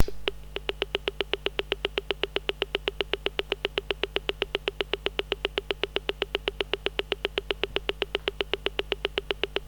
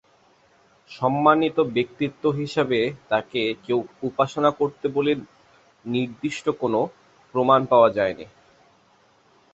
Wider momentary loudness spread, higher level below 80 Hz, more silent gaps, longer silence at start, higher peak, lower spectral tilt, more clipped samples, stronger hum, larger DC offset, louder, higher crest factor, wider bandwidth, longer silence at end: second, 1 LU vs 10 LU; first, -44 dBFS vs -62 dBFS; neither; second, 0 s vs 0.9 s; about the same, -4 dBFS vs -2 dBFS; second, -4 dB/octave vs -6.5 dB/octave; neither; first, 50 Hz at -45 dBFS vs none; neither; second, -30 LUFS vs -23 LUFS; about the same, 26 dB vs 22 dB; first, over 20 kHz vs 8.2 kHz; second, 0 s vs 1.25 s